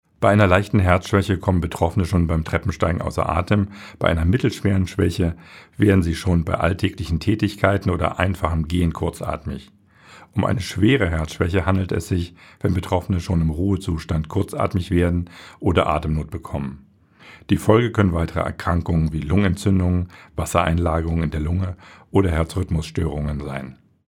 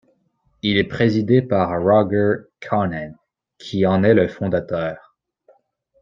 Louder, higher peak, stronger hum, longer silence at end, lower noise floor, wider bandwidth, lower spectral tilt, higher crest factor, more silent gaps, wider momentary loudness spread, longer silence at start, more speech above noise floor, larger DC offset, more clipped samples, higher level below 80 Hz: about the same, -21 LUFS vs -19 LUFS; about the same, 0 dBFS vs -2 dBFS; neither; second, 0.4 s vs 1.05 s; second, -48 dBFS vs -64 dBFS; first, 15 kHz vs 7.4 kHz; about the same, -7 dB/octave vs -8 dB/octave; about the same, 20 dB vs 18 dB; neither; about the same, 10 LU vs 12 LU; second, 0.2 s vs 0.65 s; second, 28 dB vs 46 dB; neither; neither; first, -34 dBFS vs -54 dBFS